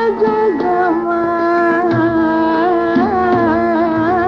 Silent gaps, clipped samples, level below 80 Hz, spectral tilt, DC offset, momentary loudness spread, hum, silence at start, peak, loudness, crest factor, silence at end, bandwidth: none; under 0.1%; -42 dBFS; -8 dB/octave; under 0.1%; 2 LU; none; 0 s; -4 dBFS; -14 LUFS; 10 dB; 0 s; 6.2 kHz